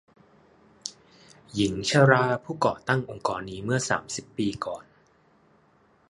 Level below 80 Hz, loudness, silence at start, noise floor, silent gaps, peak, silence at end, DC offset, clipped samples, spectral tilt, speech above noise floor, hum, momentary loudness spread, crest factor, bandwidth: -58 dBFS; -26 LUFS; 0.85 s; -62 dBFS; none; -2 dBFS; 1.3 s; under 0.1%; under 0.1%; -5 dB/octave; 37 dB; none; 20 LU; 26 dB; 11.5 kHz